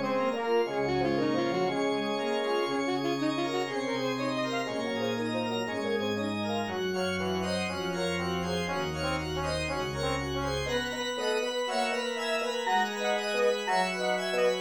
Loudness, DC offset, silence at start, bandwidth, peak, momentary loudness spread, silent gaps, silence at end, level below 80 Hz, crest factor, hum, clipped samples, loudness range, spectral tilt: -30 LUFS; under 0.1%; 0 s; 18 kHz; -14 dBFS; 4 LU; none; 0 s; -54 dBFS; 14 dB; none; under 0.1%; 2 LU; -4.5 dB/octave